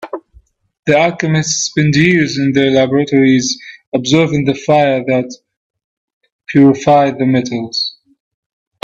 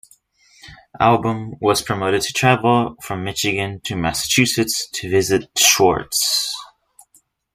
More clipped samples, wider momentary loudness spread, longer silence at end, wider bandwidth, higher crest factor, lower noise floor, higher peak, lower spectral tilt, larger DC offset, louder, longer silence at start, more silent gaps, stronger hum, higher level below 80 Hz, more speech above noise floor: neither; about the same, 10 LU vs 10 LU; about the same, 0.95 s vs 0.9 s; second, 8 kHz vs 15.5 kHz; second, 14 dB vs 20 dB; second, -48 dBFS vs -58 dBFS; about the same, 0 dBFS vs 0 dBFS; first, -5 dB/octave vs -3 dB/octave; neither; first, -13 LUFS vs -18 LUFS; second, 0 s vs 0.65 s; first, 0.79-0.83 s, 3.87-3.92 s, 5.57-5.74 s, 5.84-6.21 s, 6.32-6.39 s vs none; neither; about the same, -50 dBFS vs -48 dBFS; about the same, 37 dB vs 40 dB